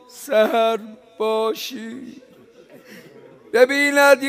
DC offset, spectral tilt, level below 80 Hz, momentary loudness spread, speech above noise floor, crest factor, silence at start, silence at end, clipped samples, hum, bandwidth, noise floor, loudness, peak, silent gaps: under 0.1%; -2.5 dB/octave; -72 dBFS; 21 LU; 30 dB; 20 dB; 0.15 s; 0 s; under 0.1%; none; 16 kHz; -48 dBFS; -19 LUFS; 0 dBFS; none